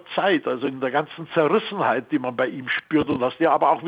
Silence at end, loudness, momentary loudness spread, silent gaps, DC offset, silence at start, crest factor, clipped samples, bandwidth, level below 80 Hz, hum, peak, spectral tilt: 0 s; -22 LUFS; 6 LU; none; under 0.1%; 0.1 s; 16 dB; under 0.1%; 5 kHz; -60 dBFS; none; -6 dBFS; -8 dB/octave